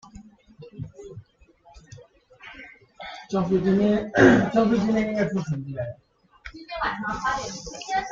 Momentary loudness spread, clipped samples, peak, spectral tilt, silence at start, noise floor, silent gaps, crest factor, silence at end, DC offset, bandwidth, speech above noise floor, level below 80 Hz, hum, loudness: 26 LU; under 0.1%; -2 dBFS; -6 dB/octave; 0.15 s; -56 dBFS; none; 22 dB; 0 s; under 0.1%; 7.6 kHz; 34 dB; -50 dBFS; none; -23 LUFS